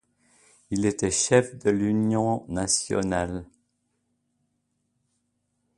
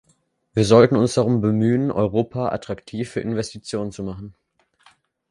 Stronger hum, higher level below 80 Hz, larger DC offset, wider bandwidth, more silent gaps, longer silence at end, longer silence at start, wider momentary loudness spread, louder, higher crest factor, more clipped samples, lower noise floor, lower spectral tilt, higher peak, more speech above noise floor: neither; about the same, -52 dBFS vs -50 dBFS; neither; about the same, 11.5 kHz vs 11.5 kHz; neither; first, 2.3 s vs 1 s; first, 0.7 s vs 0.55 s; second, 8 LU vs 17 LU; second, -25 LUFS vs -20 LUFS; about the same, 22 dB vs 20 dB; neither; first, -75 dBFS vs -64 dBFS; second, -4.5 dB/octave vs -6.5 dB/octave; second, -4 dBFS vs 0 dBFS; first, 51 dB vs 45 dB